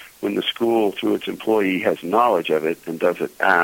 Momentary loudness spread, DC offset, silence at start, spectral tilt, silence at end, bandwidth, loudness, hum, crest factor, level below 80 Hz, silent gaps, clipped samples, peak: 5 LU; under 0.1%; 0 s; -5 dB/octave; 0 s; 17 kHz; -21 LUFS; none; 18 dB; -64 dBFS; none; under 0.1%; -2 dBFS